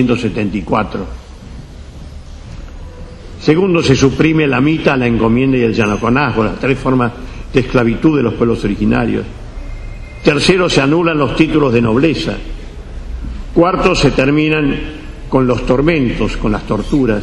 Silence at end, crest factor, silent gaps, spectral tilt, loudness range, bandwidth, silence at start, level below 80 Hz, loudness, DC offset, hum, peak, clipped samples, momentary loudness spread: 0 s; 14 dB; none; -6.5 dB/octave; 3 LU; 11 kHz; 0 s; -28 dBFS; -13 LUFS; under 0.1%; none; 0 dBFS; under 0.1%; 21 LU